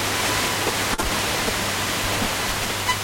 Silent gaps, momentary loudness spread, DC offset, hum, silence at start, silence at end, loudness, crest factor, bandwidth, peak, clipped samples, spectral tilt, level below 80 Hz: none; 2 LU; under 0.1%; none; 0 s; 0 s; -22 LUFS; 18 dB; 16.5 kHz; -6 dBFS; under 0.1%; -2 dB/octave; -38 dBFS